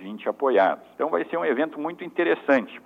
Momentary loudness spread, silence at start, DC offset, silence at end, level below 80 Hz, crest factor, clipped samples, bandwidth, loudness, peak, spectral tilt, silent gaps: 9 LU; 0 s; under 0.1%; 0.05 s; -78 dBFS; 18 dB; under 0.1%; 7.2 kHz; -24 LUFS; -6 dBFS; -6.5 dB/octave; none